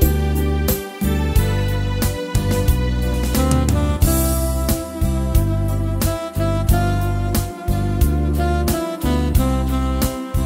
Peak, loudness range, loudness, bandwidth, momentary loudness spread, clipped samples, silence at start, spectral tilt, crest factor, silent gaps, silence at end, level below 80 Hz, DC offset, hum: -2 dBFS; 1 LU; -19 LUFS; 16.5 kHz; 4 LU; under 0.1%; 0 s; -6 dB/octave; 16 dB; none; 0 s; -22 dBFS; under 0.1%; none